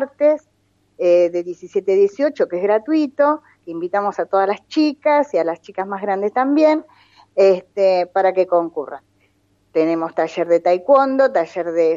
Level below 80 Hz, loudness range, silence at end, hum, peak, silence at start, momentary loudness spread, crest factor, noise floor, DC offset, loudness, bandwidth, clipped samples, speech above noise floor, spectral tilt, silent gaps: -72 dBFS; 2 LU; 0 s; none; -2 dBFS; 0 s; 10 LU; 16 dB; -62 dBFS; under 0.1%; -18 LUFS; 7.6 kHz; under 0.1%; 45 dB; -6 dB/octave; none